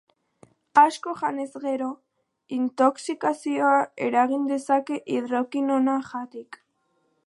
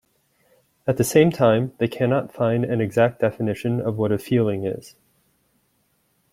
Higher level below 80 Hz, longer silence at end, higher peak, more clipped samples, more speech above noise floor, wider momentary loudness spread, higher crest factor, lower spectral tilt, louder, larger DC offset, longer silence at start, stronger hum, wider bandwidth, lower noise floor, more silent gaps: second, -78 dBFS vs -58 dBFS; second, 0.7 s vs 1.45 s; about the same, -4 dBFS vs -4 dBFS; neither; about the same, 47 dB vs 46 dB; first, 12 LU vs 9 LU; about the same, 20 dB vs 20 dB; second, -4.5 dB/octave vs -6.5 dB/octave; second, -24 LUFS vs -21 LUFS; neither; about the same, 0.75 s vs 0.85 s; neither; second, 11.5 kHz vs 16 kHz; first, -71 dBFS vs -67 dBFS; neither